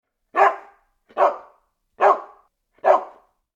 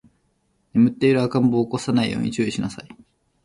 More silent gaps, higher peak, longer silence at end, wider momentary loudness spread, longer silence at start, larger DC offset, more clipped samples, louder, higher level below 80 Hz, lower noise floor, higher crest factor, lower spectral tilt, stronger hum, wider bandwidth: neither; first, -2 dBFS vs -6 dBFS; about the same, 0.5 s vs 0.5 s; first, 18 LU vs 10 LU; second, 0.35 s vs 0.75 s; neither; neither; about the same, -20 LUFS vs -21 LUFS; second, -72 dBFS vs -54 dBFS; second, -61 dBFS vs -67 dBFS; about the same, 20 dB vs 16 dB; second, -3.5 dB/octave vs -6.5 dB/octave; neither; second, 7.8 kHz vs 11.5 kHz